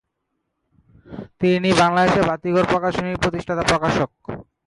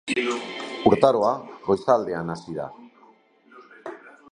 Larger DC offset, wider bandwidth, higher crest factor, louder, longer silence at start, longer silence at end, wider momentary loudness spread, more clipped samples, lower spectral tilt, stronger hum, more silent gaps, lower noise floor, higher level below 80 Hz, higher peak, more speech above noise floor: neither; about the same, 11.5 kHz vs 11 kHz; second, 16 dB vs 24 dB; first, -19 LUFS vs -23 LUFS; first, 1.1 s vs 0.05 s; about the same, 0.25 s vs 0.2 s; second, 19 LU vs 22 LU; neither; about the same, -5.5 dB/octave vs -5.5 dB/octave; neither; neither; first, -75 dBFS vs -56 dBFS; first, -44 dBFS vs -58 dBFS; about the same, -4 dBFS vs -2 dBFS; first, 57 dB vs 33 dB